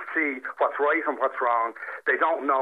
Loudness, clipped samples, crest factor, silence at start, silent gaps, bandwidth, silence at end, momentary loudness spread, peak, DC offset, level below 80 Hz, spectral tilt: -25 LUFS; under 0.1%; 14 dB; 0 s; none; 4.7 kHz; 0 s; 5 LU; -10 dBFS; under 0.1%; -86 dBFS; -4.5 dB/octave